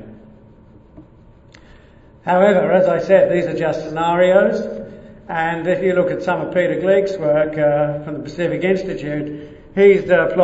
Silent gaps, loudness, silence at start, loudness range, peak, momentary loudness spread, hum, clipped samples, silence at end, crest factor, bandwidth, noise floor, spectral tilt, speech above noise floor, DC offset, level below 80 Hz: none; -17 LUFS; 0 s; 3 LU; 0 dBFS; 13 LU; none; under 0.1%; 0 s; 18 dB; 8 kHz; -46 dBFS; -7.5 dB/octave; 30 dB; under 0.1%; -48 dBFS